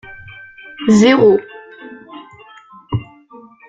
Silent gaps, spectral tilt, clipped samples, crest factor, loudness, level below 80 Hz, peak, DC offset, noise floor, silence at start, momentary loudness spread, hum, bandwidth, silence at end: none; -6 dB/octave; under 0.1%; 16 dB; -13 LUFS; -50 dBFS; 0 dBFS; under 0.1%; -42 dBFS; 0.1 s; 26 LU; none; 9 kHz; 0.65 s